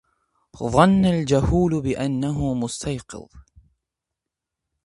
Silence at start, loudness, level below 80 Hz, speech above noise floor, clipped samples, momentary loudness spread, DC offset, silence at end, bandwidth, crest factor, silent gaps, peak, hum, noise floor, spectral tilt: 0.55 s; -21 LUFS; -38 dBFS; 64 dB; under 0.1%; 15 LU; under 0.1%; 1.45 s; 11.5 kHz; 22 dB; none; 0 dBFS; none; -85 dBFS; -6.5 dB/octave